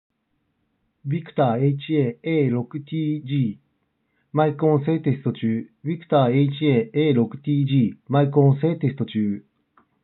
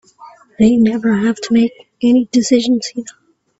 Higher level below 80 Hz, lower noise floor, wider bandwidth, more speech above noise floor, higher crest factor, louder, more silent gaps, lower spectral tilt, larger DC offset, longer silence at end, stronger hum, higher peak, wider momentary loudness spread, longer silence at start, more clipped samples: second, -76 dBFS vs -50 dBFS; first, -72 dBFS vs -42 dBFS; second, 4.1 kHz vs 8 kHz; first, 51 dB vs 28 dB; about the same, 18 dB vs 14 dB; second, -22 LUFS vs -14 LUFS; neither; first, -7.5 dB/octave vs -5 dB/octave; neither; first, 0.65 s vs 0.5 s; neither; second, -4 dBFS vs 0 dBFS; about the same, 9 LU vs 9 LU; first, 1.05 s vs 0.2 s; neither